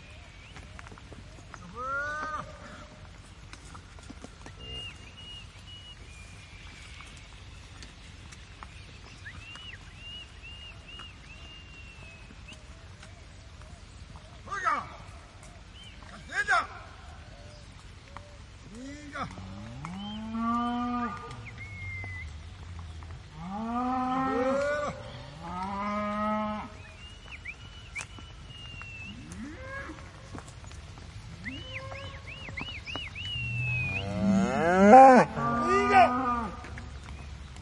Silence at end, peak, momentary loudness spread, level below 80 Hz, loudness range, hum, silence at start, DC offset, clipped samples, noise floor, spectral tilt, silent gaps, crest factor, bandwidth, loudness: 0 s; -2 dBFS; 21 LU; -50 dBFS; 24 LU; none; 0 s; under 0.1%; under 0.1%; -48 dBFS; -5.5 dB/octave; none; 28 dB; 11 kHz; -27 LUFS